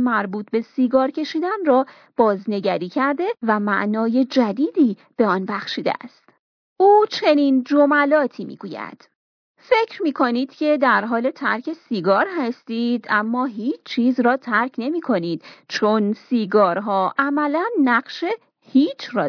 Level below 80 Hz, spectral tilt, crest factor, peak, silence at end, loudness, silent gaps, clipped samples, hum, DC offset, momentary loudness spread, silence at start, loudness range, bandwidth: -72 dBFS; -6.5 dB/octave; 16 dB; -4 dBFS; 0 s; -20 LUFS; 6.39-6.76 s, 9.15-9.55 s; under 0.1%; none; under 0.1%; 9 LU; 0 s; 3 LU; 5.4 kHz